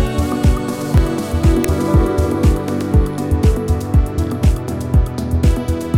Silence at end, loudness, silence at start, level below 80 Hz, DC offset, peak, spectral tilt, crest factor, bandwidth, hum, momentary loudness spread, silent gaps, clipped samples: 0 s; -17 LUFS; 0 s; -18 dBFS; under 0.1%; -2 dBFS; -7.5 dB/octave; 14 dB; over 20 kHz; none; 4 LU; none; under 0.1%